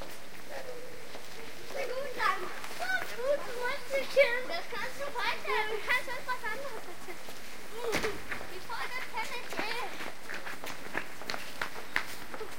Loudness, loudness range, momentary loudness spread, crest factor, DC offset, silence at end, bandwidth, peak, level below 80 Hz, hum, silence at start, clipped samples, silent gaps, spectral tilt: -35 LUFS; 6 LU; 14 LU; 26 dB; 2%; 0 s; 16.5 kHz; -10 dBFS; -62 dBFS; none; 0 s; under 0.1%; none; -2.5 dB/octave